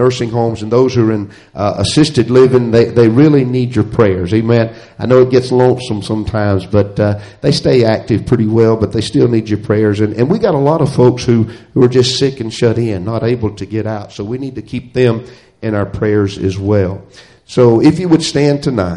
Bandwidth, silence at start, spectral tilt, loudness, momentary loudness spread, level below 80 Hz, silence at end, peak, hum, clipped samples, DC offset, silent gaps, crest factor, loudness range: 11 kHz; 0 s; -7 dB/octave; -13 LUFS; 10 LU; -40 dBFS; 0 s; 0 dBFS; none; under 0.1%; under 0.1%; none; 12 dB; 6 LU